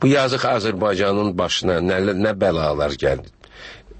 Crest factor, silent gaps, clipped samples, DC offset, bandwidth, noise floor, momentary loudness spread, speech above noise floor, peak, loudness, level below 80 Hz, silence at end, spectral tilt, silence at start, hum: 16 dB; none; under 0.1%; under 0.1%; 8.8 kHz; -41 dBFS; 8 LU; 22 dB; -4 dBFS; -20 LUFS; -42 dBFS; 0 s; -5.5 dB/octave; 0 s; none